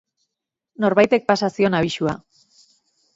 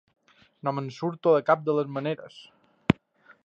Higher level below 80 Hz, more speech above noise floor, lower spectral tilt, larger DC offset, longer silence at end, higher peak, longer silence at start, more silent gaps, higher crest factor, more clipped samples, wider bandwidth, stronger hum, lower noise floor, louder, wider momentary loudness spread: about the same, -56 dBFS vs -58 dBFS; first, 65 dB vs 32 dB; second, -6 dB/octave vs -8 dB/octave; neither; first, 1 s vs 0.5 s; about the same, -2 dBFS vs -2 dBFS; first, 0.8 s vs 0.65 s; neither; second, 20 dB vs 26 dB; neither; about the same, 8 kHz vs 7.8 kHz; neither; first, -83 dBFS vs -59 dBFS; first, -19 LUFS vs -27 LUFS; about the same, 9 LU vs 11 LU